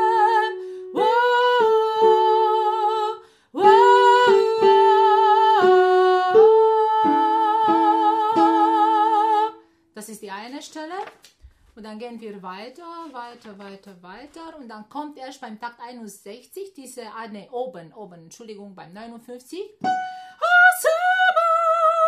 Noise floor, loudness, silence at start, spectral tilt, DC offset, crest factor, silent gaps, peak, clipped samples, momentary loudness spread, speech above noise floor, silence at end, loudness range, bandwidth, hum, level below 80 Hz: -52 dBFS; -17 LUFS; 0 s; -3.5 dB/octave; under 0.1%; 18 dB; none; -2 dBFS; under 0.1%; 23 LU; 18 dB; 0 s; 22 LU; 15.5 kHz; none; -68 dBFS